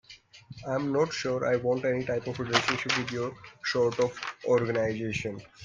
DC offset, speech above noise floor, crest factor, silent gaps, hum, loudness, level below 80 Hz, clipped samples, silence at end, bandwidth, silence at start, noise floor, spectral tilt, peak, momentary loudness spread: under 0.1%; 21 dB; 22 dB; none; none; -29 LUFS; -62 dBFS; under 0.1%; 0 s; 9.6 kHz; 0.1 s; -50 dBFS; -4.5 dB/octave; -6 dBFS; 9 LU